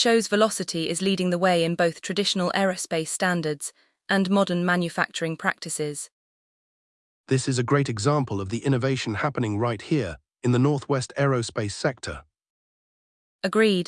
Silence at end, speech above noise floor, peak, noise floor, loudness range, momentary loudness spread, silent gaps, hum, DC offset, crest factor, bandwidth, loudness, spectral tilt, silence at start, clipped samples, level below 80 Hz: 0.05 s; over 66 dB; -6 dBFS; under -90 dBFS; 3 LU; 8 LU; 6.12-7.24 s, 12.50-13.39 s; none; under 0.1%; 18 dB; 12 kHz; -24 LUFS; -5 dB/octave; 0 s; under 0.1%; -60 dBFS